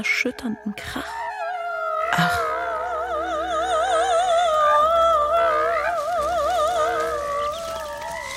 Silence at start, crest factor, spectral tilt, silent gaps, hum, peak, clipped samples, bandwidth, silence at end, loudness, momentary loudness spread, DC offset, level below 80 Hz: 0 s; 16 dB; -3.5 dB/octave; none; none; -6 dBFS; under 0.1%; 16 kHz; 0 s; -22 LUFS; 12 LU; under 0.1%; -48 dBFS